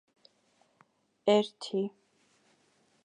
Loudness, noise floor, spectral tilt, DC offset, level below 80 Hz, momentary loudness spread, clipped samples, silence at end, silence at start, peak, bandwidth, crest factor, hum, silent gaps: -30 LUFS; -70 dBFS; -5.5 dB/octave; under 0.1%; -88 dBFS; 8 LU; under 0.1%; 1.15 s; 1.25 s; -14 dBFS; 10 kHz; 22 dB; none; none